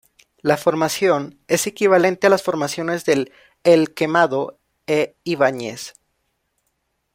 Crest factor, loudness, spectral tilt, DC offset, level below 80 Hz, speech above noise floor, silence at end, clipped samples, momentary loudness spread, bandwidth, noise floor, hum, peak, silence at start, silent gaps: 18 dB; -19 LUFS; -4.5 dB/octave; under 0.1%; -62 dBFS; 53 dB; 1.25 s; under 0.1%; 13 LU; 16.5 kHz; -71 dBFS; none; -2 dBFS; 0.45 s; none